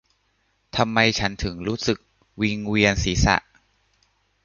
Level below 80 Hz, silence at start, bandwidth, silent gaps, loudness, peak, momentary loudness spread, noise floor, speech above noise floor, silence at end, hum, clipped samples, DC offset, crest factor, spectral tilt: -36 dBFS; 0.75 s; 7.4 kHz; none; -22 LUFS; -2 dBFS; 9 LU; -68 dBFS; 46 dB; 1.05 s; none; under 0.1%; under 0.1%; 22 dB; -4.5 dB/octave